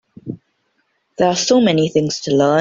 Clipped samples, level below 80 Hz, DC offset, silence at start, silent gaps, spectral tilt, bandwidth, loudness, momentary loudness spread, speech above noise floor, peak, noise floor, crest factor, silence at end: under 0.1%; -56 dBFS; under 0.1%; 0.25 s; none; -4.5 dB/octave; 7.8 kHz; -15 LUFS; 20 LU; 51 dB; -2 dBFS; -66 dBFS; 14 dB; 0 s